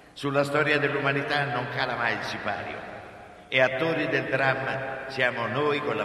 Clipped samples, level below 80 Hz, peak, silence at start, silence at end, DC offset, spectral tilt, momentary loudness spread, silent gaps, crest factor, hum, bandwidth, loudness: under 0.1%; -62 dBFS; -6 dBFS; 0.15 s; 0 s; under 0.1%; -5.5 dB/octave; 11 LU; none; 20 dB; none; 13.5 kHz; -26 LUFS